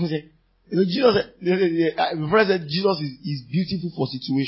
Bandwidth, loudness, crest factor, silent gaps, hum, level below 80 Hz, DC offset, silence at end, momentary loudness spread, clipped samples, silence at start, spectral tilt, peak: 5.8 kHz; -22 LUFS; 20 dB; none; none; -56 dBFS; under 0.1%; 0 s; 9 LU; under 0.1%; 0 s; -10 dB/octave; -2 dBFS